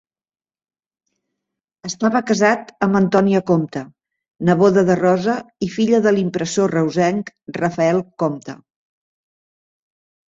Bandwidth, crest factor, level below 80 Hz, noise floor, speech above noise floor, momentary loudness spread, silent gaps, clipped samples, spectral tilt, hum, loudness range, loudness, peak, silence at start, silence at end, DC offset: 8 kHz; 18 dB; -58 dBFS; under -90 dBFS; over 73 dB; 12 LU; none; under 0.1%; -6 dB/octave; none; 5 LU; -18 LUFS; -2 dBFS; 1.85 s; 1.7 s; under 0.1%